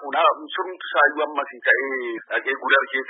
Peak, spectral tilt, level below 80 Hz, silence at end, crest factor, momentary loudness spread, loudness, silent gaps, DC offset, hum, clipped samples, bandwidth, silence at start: -4 dBFS; -5.5 dB/octave; under -90 dBFS; 0 s; 18 dB; 9 LU; -21 LUFS; none; under 0.1%; none; under 0.1%; 4 kHz; 0 s